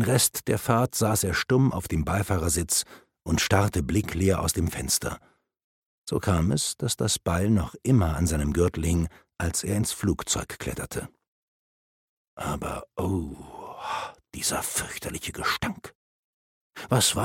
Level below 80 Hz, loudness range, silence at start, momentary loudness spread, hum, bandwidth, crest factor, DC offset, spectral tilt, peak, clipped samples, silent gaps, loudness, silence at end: -40 dBFS; 8 LU; 0 s; 12 LU; none; 17 kHz; 24 dB; under 0.1%; -4.5 dB/octave; -4 dBFS; under 0.1%; 5.64-6.05 s, 11.28-12.37 s, 15.95-16.70 s; -26 LUFS; 0 s